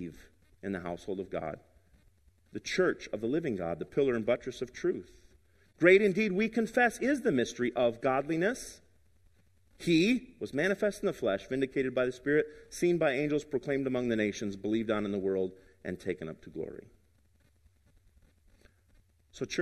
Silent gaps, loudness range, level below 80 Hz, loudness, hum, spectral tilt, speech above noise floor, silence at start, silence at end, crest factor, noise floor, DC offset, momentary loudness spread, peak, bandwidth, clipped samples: none; 9 LU; -62 dBFS; -31 LUFS; none; -5.5 dB/octave; 37 dB; 0 s; 0 s; 24 dB; -68 dBFS; under 0.1%; 14 LU; -8 dBFS; 13 kHz; under 0.1%